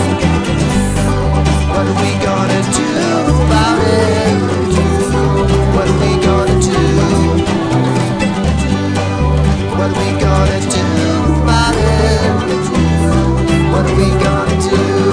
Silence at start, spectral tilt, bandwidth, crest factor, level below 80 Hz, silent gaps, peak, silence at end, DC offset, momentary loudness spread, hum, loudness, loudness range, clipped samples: 0 s; -6 dB/octave; 10.5 kHz; 12 dB; -20 dBFS; none; 0 dBFS; 0 s; under 0.1%; 3 LU; none; -13 LUFS; 1 LU; under 0.1%